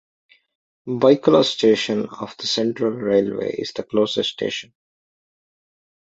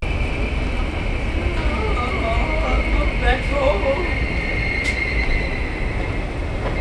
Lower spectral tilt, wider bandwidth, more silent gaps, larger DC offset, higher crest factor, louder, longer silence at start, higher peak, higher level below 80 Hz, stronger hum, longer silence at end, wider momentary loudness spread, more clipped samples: about the same, -5 dB/octave vs -6 dB/octave; second, 8 kHz vs 10 kHz; neither; neither; about the same, 20 dB vs 16 dB; about the same, -20 LUFS vs -22 LUFS; first, 0.85 s vs 0 s; first, 0 dBFS vs -4 dBFS; second, -62 dBFS vs -22 dBFS; neither; first, 1.5 s vs 0 s; first, 12 LU vs 5 LU; neither